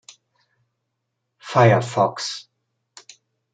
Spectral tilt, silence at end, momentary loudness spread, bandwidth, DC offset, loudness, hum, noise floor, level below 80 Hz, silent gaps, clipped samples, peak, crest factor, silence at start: -5.5 dB/octave; 1.15 s; 18 LU; 9.2 kHz; under 0.1%; -19 LUFS; none; -78 dBFS; -66 dBFS; none; under 0.1%; -2 dBFS; 22 dB; 1.45 s